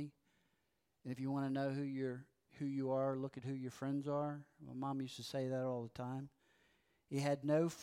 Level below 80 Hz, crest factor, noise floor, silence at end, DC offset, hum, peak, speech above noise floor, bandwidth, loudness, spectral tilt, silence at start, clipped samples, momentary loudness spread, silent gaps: -82 dBFS; 16 dB; -84 dBFS; 0 s; under 0.1%; none; -26 dBFS; 43 dB; 15.5 kHz; -42 LUFS; -7 dB/octave; 0 s; under 0.1%; 12 LU; none